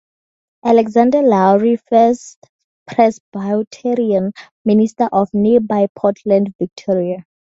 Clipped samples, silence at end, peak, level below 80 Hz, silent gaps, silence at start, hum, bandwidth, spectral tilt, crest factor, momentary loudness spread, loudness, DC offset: under 0.1%; 0.4 s; 0 dBFS; -58 dBFS; 2.36-2.42 s, 2.49-2.86 s, 3.20-3.32 s, 3.67-3.71 s, 4.51-4.65 s, 5.89-5.95 s, 6.55-6.59 s; 0.65 s; none; 7.8 kHz; -7.5 dB/octave; 16 dB; 11 LU; -15 LUFS; under 0.1%